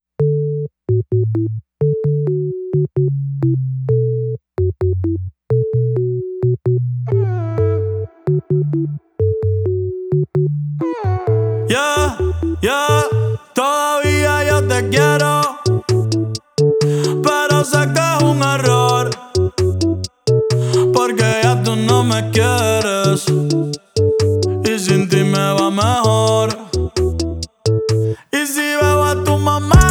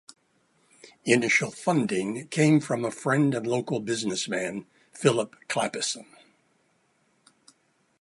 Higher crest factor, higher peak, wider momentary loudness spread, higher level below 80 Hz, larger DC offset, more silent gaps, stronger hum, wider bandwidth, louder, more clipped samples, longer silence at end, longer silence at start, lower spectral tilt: second, 16 dB vs 22 dB; first, 0 dBFS vs -6 dBFS; second, 6 LU vs 9 LU; first, -32 dBFS vs -72 dBFS; neither; neither; neither; first, 18 kHz vs 11.5 kHz; first, -16 LUFS vs -26 LUFS; neither; second, 0 s vs 2 s; second, 0.2 s vs 0.85 s; about the same, -5.5 dB/octave vs -4.5 dB/octave